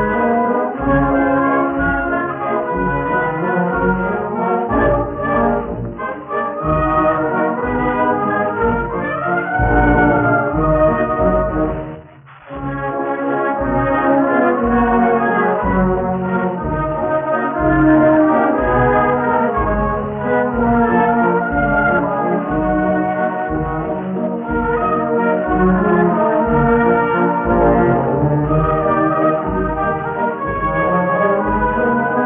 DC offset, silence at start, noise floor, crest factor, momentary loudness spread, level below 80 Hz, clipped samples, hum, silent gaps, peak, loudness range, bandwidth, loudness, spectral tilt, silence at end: under 0.1%; 0 s; -40 dBFS; 14 dB; 6 LU; -30 dBFS; under 0.1%; none; none; 0 dBFS; 3 LU; 3.7 kHz; -16 LUFS; -7 dB/octave; 0 s